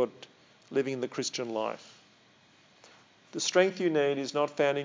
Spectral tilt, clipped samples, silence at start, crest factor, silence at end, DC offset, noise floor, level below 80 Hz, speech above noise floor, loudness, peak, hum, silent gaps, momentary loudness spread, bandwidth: -3.5 dB/octave; under 0.1%; 0 s; 22 dB; 0 s; under 0.1%; -61 dBFS; -88 dBFS; 32 dB; -30 LUFS; -10 dBFS; none; none; 11 LU; 7.6 kHz